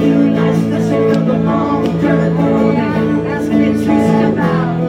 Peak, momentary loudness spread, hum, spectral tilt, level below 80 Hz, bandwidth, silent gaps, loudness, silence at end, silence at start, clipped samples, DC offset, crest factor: -2 dBFS; 3 LU; none; -8 dB/octave; -40 dBFS; 11 kHz; none; -13 LUFS; 0 s; 0 s; under 0.1%; under 0.1%; 10 dB